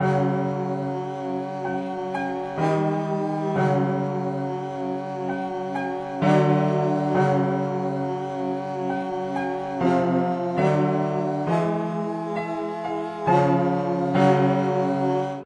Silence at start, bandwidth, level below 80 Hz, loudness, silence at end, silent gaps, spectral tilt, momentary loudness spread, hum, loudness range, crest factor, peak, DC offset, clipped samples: 0 s; 9.4 kHz; -64 dBFS; -24 LUFS; 0 s; none; -8 dB/octave; 9 LU; none; 3 LU; 18 dB; -6 dBFS; under 0.1%; under 0.1%